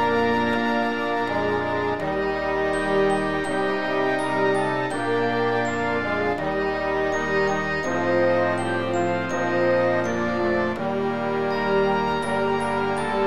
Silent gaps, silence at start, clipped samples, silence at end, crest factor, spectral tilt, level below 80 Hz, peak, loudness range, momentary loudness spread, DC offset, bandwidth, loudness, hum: none; 0 s; under 0.1%; 0 s; 14 dB; -5.5 dB/octave; -50 dBFS; -10 dBFS; 1 LU; 3 LU; 1%; 12.5 kHz; -23 LUFS; none